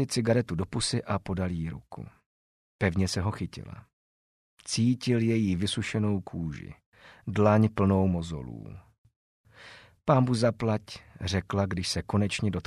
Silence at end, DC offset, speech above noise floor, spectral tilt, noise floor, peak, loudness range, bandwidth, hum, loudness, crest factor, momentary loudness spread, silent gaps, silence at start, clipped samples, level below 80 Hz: 0.05 s; under 0.1%; 24 dB; -6 dB/octave; -52 dBFS; -10 dBFS; 5 LU; 12.5 kHz; none; -28 LUFS; 20 dB; 21 LU; 2.26-2.79 s, 3.93-4.57 s, 6.86-6.92 s, 8.98-9.05 s, 9.16-9.44 s; 0 s; under 0.1%; -52 dBFS